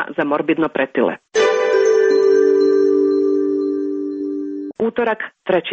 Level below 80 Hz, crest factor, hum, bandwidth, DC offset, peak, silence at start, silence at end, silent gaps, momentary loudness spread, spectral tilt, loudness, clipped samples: -62 dBFS; 12 dB; none; 7.8 kHz; under 0.1%; -4 dBFS; 0 s; 0 s; none; 10 LU; -5 dB/octave; -17 LUFS; under 0.1%